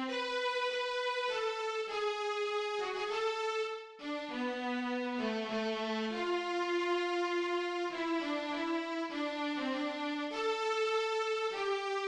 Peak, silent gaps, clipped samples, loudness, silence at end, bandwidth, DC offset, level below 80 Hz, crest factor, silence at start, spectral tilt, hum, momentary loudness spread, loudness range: -22 dBFS; none; under 0.1%; -35 LUFS; 0 s; 10.5 kHz; under 0.1%; -76 dBFS; 12 dB; 0 s; -3 dB/octave; none; 4 LU; 2 LU